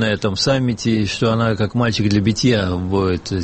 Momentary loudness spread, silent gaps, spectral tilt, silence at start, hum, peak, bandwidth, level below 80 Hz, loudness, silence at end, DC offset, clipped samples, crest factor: 3 LU; none; -5.5 dB/octave; 0 s; none; -4 dBFS; 8.8 kHz; -42 dBFS; -18 LUFS; 0 s; 0.1%; under 0.1%; 14 dB